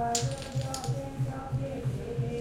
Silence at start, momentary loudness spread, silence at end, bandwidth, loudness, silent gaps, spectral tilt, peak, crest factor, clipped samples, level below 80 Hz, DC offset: 0 s; 4 LU; 0 s; 16.5 kHz; -33 LUFS; none; -5 dB/octave; -14 dBFS; 18 dB; under 0.1%; -48 dBFS; under 0.1%